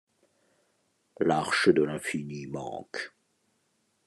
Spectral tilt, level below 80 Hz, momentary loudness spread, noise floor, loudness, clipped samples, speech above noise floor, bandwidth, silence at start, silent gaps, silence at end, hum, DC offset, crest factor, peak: -5 dB/octave; -68 dBFS; 15 LU; -73 dBFS; -28 LUFS; under 0.1%; 45 dB; 12.5 kHz; 1.2 s; none; 1 s; none; under 0.1%; 24 dB; -8 dBFS